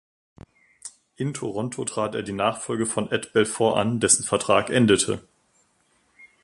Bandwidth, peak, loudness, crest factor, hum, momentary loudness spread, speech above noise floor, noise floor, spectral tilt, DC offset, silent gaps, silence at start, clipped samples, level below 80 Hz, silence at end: 11.5 kHz; -4 dBFS; -23 LUFS; 22 dB; none; 13 LU; 43 dB; -65 dBFS; -3.5 dB/octave; under 0.1%; none; 0.85 s; under 0.1%; -56 dBFS; 0.2 s